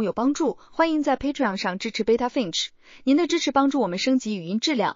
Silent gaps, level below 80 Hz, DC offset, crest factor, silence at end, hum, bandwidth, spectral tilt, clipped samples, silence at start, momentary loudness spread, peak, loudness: none; -54 dBFS; under 0.1%; 16 dB; 0 s; none; 7.6 kHz; -4 dB/octave; under 0.1%; 0 s; 6 LU; -6 dBFS; -24 LUFS